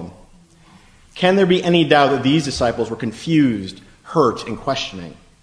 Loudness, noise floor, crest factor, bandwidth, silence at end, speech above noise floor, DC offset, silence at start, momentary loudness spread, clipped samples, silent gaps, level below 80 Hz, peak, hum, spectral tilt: -17 LUFS; -48 dBFS; 18 dB; 10.5 kHz; 0.3 s; 31 dB; under 0.1%; 0 s; 18 LU; under 0.1%; none; -46 dBFS; 0 dBFS; none; -5.5 dB/octave